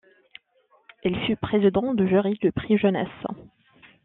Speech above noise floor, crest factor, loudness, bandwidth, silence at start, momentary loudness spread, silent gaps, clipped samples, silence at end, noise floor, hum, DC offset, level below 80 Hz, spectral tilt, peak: 41 dB; 16 dB; -23 LUFS; 4 kHz; 1.05 s; 12 LU; none; under 0.1%; 0.6 s; -63 dBFS; none; under 0.1%; -54 dBFS; -6 dB/octave; -8 dBFS